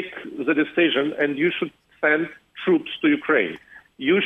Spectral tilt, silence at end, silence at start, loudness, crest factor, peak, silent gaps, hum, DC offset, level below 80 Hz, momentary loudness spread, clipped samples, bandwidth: -7 dB/octave; 0 s; 0 s; -22 LUFS; 16 dB; -6 dBFS; none; none; under 0.1%; -68 dBFS; 10 LU; under 0.1%; 3.9 kHz